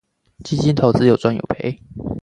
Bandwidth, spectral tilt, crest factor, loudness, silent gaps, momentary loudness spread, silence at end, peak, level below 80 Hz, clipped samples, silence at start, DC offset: 10.5 kHz; -7.5 dB/octave; 18 dB; -18 LUFS; none; 15 LU; 0.05 s; 0 dBFS; -44 dBFS; under 0.1%; 0.4 s; under 0.1%